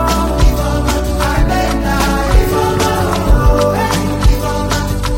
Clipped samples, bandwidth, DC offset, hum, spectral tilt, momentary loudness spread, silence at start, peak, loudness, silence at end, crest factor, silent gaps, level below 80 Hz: under 0.1%; 16.5 kHz; under 0.1%; none; -5.5 dB/octave; 4 LU; 0 s; 0 dBFS; -14 LUFS; 0 s; 12 dB; none; -16 dBFS